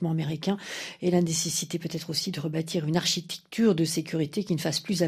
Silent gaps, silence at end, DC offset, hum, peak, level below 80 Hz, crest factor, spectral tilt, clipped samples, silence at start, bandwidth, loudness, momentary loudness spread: none; 0 s; under 0.1%; none; -10 dBFS; -66 dBFS; 18 dB; -4.5 dB/octave; under 0.1%; 0 s; 15.5 kHz; -28 LUFS; 7 LU